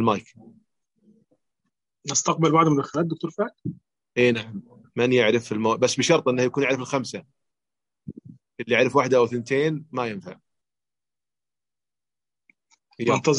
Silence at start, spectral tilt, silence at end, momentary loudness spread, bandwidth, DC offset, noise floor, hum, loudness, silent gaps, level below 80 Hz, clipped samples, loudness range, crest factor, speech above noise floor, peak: 0 s; -4.5 dB/octave; 0 s; 18 LU; 11 kHz; under 0.1%; under -90 dBFS; none; -22 LUFS; none; -68 dBFS; under 0.1%; 8 LU; 20 dB; over 68 dB; -6 dBFS